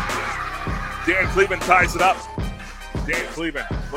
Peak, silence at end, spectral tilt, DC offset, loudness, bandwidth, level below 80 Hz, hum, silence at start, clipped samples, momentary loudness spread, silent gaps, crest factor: 0 dBFS; 0 s; -4.5 dB/octave; under 0.1%; -21 LUFS; 16 kHz; -34 dBFS; none; 0 s; under 0.1%; 14 LU; none; 22 dB